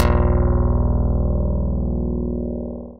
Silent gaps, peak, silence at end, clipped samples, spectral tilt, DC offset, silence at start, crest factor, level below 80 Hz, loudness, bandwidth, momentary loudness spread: none; -2 dBFS; 0 s; under 0.1%; -9 dB/octave; 3%; 0 s; 16 dB; -22 dBFS; -21 LUFS; 5.4 kHz; 7 LU